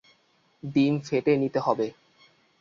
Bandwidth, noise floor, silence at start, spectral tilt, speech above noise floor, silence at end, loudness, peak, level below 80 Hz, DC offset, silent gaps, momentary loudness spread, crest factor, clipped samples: 7.4 kHz; -66 dBFS; 0.65 s; -7.5 dB/octave; 41 dB; 0.7 s; -26 LUFS; -8 dBFS; -68 dBFS; under 0.1%; none; 7 LU; 20 dB; under 0.1%